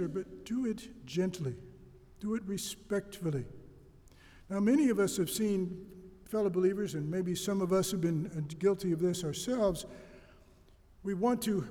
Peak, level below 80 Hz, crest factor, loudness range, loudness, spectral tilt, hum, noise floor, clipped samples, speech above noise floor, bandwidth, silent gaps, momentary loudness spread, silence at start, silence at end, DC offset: -18 dBFS; -60 dBFS; 16 dB; 6 LU; -33 LUFS; -6 dB/octave; none; -60 dBFS; under 0.1%; 28 dB; 19.5 kHz; none; 12 LU; 0 s; 0 s; under 0.1%